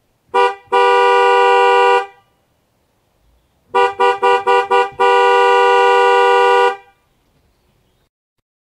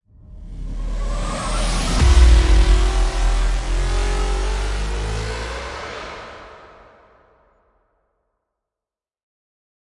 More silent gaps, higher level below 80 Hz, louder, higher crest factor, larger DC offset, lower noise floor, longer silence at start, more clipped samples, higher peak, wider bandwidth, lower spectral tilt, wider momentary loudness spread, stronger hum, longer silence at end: neither; second, -62 dBFS vs -20 dBFS; first, -12 LUFS vs -21 LUFS; about the same, 14 dB vs 18 dB; neither; second, -61 dBFS vs -90 dBFS; about the same, 0.35 s vs 0.3 s; neither; about the same, 0 dBFS vs -2 dBFS; about the same, 12 kHz vs 11.5 kHz; second, -2 dB/octave vs -5 dB/octave; second, 6 LU vs 19 LU; neither; second, 1.95 s vs 3.45 s